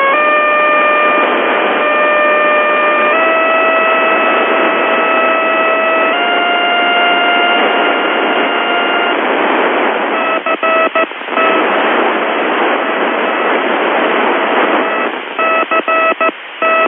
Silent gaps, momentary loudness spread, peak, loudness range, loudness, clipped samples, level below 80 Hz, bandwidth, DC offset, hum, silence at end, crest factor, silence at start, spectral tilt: none; 4 LU; 0 dBFS; 2 LU; -11 LUFS; under 0.1%; -78 dBFS; 3.9 kHz; under 0.1%; none; 0 s; 12 dB; 0 s; -8.5 dB/octave